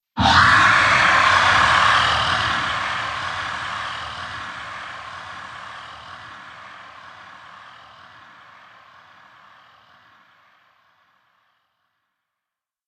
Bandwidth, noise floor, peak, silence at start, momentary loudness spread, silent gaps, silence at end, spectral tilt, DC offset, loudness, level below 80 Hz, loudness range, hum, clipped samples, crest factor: 11 kHz; -86 dBFS; -2 dBFS; 0.15 s; 25 LU; none; 5.2 s; -2.5 dB/octave; under 0.1%; -16 LUFS; -46 dBFS; 26 LU; none; under 0.1%; 20 dB